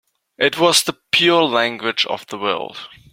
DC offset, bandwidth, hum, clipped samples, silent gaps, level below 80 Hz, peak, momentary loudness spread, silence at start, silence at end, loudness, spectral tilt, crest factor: under 0.1%; 16.5 kHz; none; under 0.1%; none; -62 dBFS; 0 dBFS; 11 LU; 0.4 s; 0.25 s; -17 LUFS; -2.5 dB/octave; 18 dB